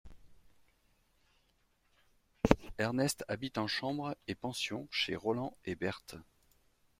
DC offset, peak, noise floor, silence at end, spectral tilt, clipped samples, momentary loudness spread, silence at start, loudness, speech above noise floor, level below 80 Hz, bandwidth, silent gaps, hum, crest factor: under 0.1%; -4 dBFS; -74 dBFS; 0.75 s; -4.5 dB/octave; under 0.1%; 9 LU; 0.05 s; -36 LUFS; 37 dB; -56 dBFS; 16 kHz; none; none; 34 dB